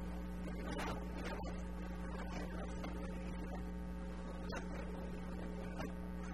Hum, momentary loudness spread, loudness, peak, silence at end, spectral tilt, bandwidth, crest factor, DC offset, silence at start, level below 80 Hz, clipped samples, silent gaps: none; 3 LU; -46 LUFS; -30 dBFS; 0 s; -6.5 dB/octave; 13 kHz; 14 dB; 0.2%; 0 s; -48 dBFS; under 0.1%; none